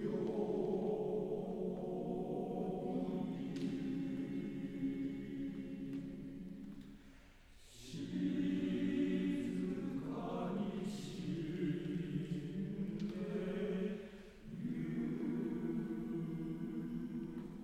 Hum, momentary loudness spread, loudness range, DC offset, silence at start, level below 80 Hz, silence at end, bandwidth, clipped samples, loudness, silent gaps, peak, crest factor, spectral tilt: none; 10 LU; 5 LU; under 0.1%; 0 s; -62 dBFS; 0 s; 13 kHz; under 0.1%; -41 LUFS; none; -26 dBFS; 14 dB; -8 dB/octave